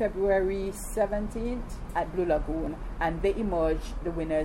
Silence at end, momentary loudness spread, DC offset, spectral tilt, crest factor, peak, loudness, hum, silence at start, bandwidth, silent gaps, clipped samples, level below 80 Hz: 0 s; 8 LU; under 0.1%; -6.5 dB/octave; 14 dB; -14 dBFS; -30 LUFS; none; 0 s; 16 kHz; none; under 0.1%; -36 dBFS